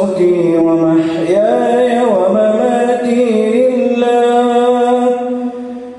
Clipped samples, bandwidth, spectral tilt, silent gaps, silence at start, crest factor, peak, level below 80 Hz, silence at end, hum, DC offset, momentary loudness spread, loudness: under 0.1%; 11 kHz; -6.5 dB/octave; none; 0 s; 10 dB; -2 dBFS; -56 dBFS; 0 s; none; under 0.1%; 3 LU; -12 LUFS